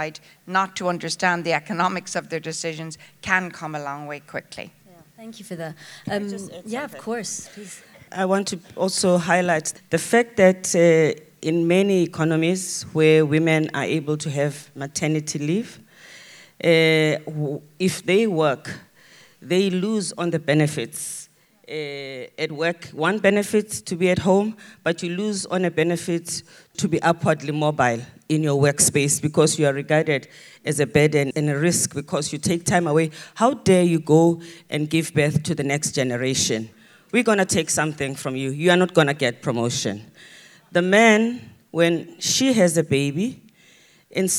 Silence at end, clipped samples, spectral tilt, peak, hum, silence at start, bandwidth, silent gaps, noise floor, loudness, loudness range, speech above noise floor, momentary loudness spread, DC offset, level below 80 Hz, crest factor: 0 s; under 0.1%; -4.5 dB/octave; 0 dBFS; none; 0 s; 19.5 kHz; none; -54 dBFS; -21 LUFS; 8 LU; 33 dB; 14 LU; under 0.1%; -60 dBFS; 22 dB